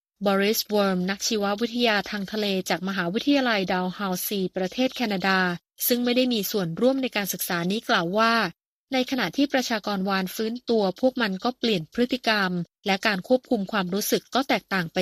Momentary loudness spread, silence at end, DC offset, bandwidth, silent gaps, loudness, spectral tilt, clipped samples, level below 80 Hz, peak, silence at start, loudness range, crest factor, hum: 5 LU; 0 s; under 0.1%; 15.5 kHz; 8.67-8.88 s; -24 LUFS; -4 dB/octave; under 0.1%; -64 dBFS; -6 dBFS; 0.2 s; 1 LU; 20 dB; none